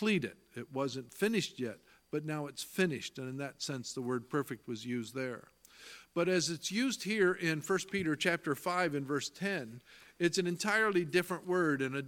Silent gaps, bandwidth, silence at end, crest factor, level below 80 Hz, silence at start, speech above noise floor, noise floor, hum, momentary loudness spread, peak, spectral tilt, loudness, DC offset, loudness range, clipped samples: none; 17.5 kHz; 0 s; 20 dB; -74 dBFS; 0 s; 20 dB; -55 dBFS; none; 11 LU; -14 dBFS; -4.5 dB/octave; -35 LUFS; under 0.1%; 5 LU; under 0.1%